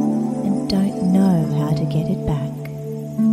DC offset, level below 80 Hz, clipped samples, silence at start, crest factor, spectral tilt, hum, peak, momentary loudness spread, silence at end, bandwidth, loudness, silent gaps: under 0.1%; -42 dBFS; under 0.1%; 0 s; 14 dB; -8 dB/octave; none; -6 dBFS; 11 LU; 0 s; 14.5 kHz; -20 LUFS; none